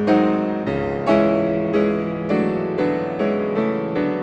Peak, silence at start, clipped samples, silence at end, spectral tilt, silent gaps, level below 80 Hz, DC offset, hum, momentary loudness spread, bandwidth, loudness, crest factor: -4 dBFS; 0 s; under 0.1%; 0 s; -8.5 dB/octave; none; -48 dBFS; under 0.1%; none; 5 LU; 8.2 kHz; -20 LUFS; 16 dB